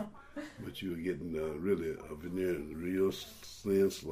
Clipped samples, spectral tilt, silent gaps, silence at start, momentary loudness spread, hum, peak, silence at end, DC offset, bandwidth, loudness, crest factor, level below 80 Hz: under 0.1%; -6 dB/octave; none; 0 s; 14 LU; none; -18 dBFS; 0 s; under 0.1%; 15.5 kHz; -36 LUFS; 16 dB; -60 dBFS